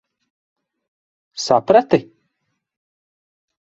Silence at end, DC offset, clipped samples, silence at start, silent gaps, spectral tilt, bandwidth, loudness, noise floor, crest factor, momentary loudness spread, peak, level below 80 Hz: 1.75 s; under 0.1%; under 0.1%; 1.35 s; none; -5 dB/octave; 8 kHz; -16 LUFS; -74 dBFS; 22 dB; 14 LU; 0 dBFS; -62 dBFS